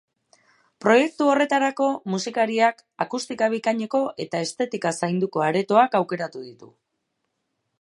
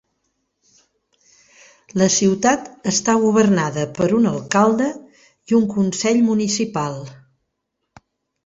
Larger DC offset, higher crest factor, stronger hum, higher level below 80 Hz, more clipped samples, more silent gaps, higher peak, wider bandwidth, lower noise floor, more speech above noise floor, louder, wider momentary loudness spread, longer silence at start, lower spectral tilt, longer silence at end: neither; about the same, 20 dB vs 18 dB; neither; second, -76 dBFS vs -58 dBFS; neither; neither; about the same, -2 dBFS vs -2 dBFS; first, 11.5 kHz vs 8 kHz; about the same, -77 dBFS vs -76 dBFS; second, 54 dB vs 58 dB; second, -23 LUFS vs -18 LUFS; about the same, 10 LU vs 9 LU; second, 0.85 s vs 1.95 s; about the same, -5 dB/octave vs -4.5 dB/octave; second, 1.15 s vs 1.3 s